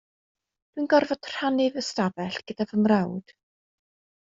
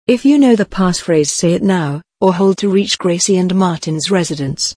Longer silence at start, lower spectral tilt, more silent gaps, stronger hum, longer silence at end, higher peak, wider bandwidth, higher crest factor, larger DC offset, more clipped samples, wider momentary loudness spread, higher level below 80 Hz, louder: first, 0.75 s vs 0.1 s; about the same, -5.5 dB/octave vs -5 dB/octave; neither; neither; first, 1.15 s vs 0.05 s; second, -8 dBFS vs 0 dBFS; second, 7.6 kHz vs 10.5 kHz; first, 20 dB vs 14 dB; neither; neither; first, 11 LU vs 6 LU; second, -68 dBFS vs -44 dBFS; second, -25 LUFS vs -14 LUFS